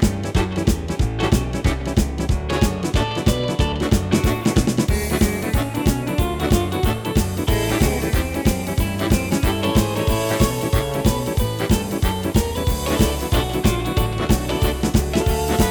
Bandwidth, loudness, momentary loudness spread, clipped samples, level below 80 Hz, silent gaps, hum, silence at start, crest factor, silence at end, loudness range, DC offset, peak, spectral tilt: over 20 kHz; -20 LUFS; 3 LU; under 0.1%; -26 dBFS; none; none; 0 s; 18 dB; 0 s; 1 LU; under 0.1%; -2 dBFS; -5.5 dB/octave